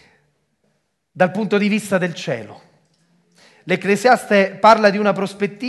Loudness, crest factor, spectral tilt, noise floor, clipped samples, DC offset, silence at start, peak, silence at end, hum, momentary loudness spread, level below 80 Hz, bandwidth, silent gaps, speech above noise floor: -17 LUFS; 18 dB; -5.5 dB/octave; -68 dBFS; under 0.1%; under 0.1%; 1.15 s; 0 dBFS; 0 s; none; 11 LU; -66 dBFS; 12.5 kHz; none; 51 dB